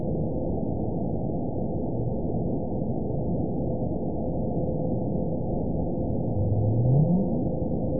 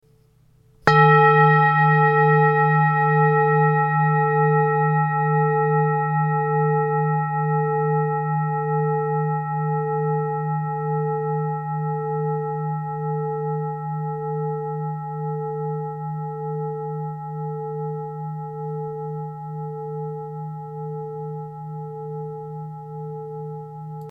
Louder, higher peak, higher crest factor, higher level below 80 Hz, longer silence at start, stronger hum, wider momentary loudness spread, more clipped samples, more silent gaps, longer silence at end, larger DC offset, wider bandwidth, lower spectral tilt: second, -28 LUFS vs -21 LUFS; second, -10 dBFS vs 0 dBFS; second, 16 dB vs 22 dB; first, -38 dBFS vs -62 dBFS; second, 0 s vs 0.85 s; neither; second, 6 LU vs 16 LU; neither; neither; about the same, 0 s vs 0 s; first, 2% vs under 0.1%; second, 1 kHz vs 5.4 kHz; first, -19.5 dB/octave vs -9.5 dB/octave